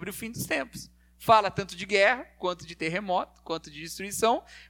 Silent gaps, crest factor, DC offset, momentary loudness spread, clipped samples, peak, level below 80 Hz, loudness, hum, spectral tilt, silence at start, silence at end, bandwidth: none; 22 dB; under 0.1%; 14 LU; under 0.1%; -8 dBFS; -58 dBFS; -27 LUFS; none; -3.5 dB/octave; 0 s; 0.05 s; 19 kHz